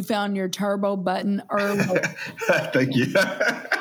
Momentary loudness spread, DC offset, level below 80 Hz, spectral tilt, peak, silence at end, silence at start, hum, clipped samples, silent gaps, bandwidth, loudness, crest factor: 5 LU; under 0.1%; -74 dBFS; -5 dB/octave; -4 dBFS; 0 s; 0 s; none; under 0.1%; none; over 20 kHz; -23 LUFS; 18 dB